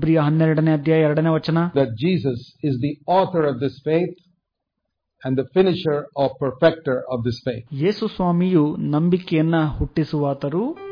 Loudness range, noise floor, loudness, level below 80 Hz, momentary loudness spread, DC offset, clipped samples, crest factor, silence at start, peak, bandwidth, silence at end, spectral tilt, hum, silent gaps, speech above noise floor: 3 LU; -79 dBFS; -20 LUFS; -44 dBFS; 8 LU; under 0.1%; under 0.1%; 18 dB; 0 s; -2 dBFS; 5.2 kHz; 0 s; -9.5 dB/octave; none; none; 59 dB